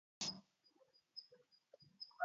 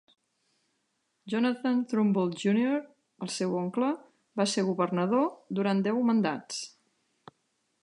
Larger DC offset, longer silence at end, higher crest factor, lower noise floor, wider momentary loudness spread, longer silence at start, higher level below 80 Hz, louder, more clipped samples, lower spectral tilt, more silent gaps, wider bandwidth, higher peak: neither; second, 0 s vs 1.15 s; first, 24 dB vs 16 dB; about the same, -76 dBFS vs -77 dBFS; first, 22 LU vs 11 LU; second, 0.2 s vs 1.25 s; second, under -90 dBFS vs -80 dBFS; second, -50 LUFS vs -29 LUFS; neither; second, -0.5 dB/octave vs -5.5 dB/octave; neither; second, 7.4 kHz vs 11.5 kHz; second, -28 dBFS vs -12 dBFS